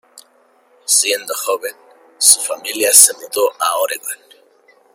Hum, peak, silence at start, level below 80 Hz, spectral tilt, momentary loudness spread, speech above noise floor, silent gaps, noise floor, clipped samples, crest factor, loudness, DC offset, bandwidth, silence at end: none; 0 dBFS; 0.15 s; -68 dBFS; 2 dB/octave; 19 LU; 39 dB; none; -54 dBFS; 0.3%; 18 dB; -13 LUFS; under 0.1%; over 20 kHz; 0.8 s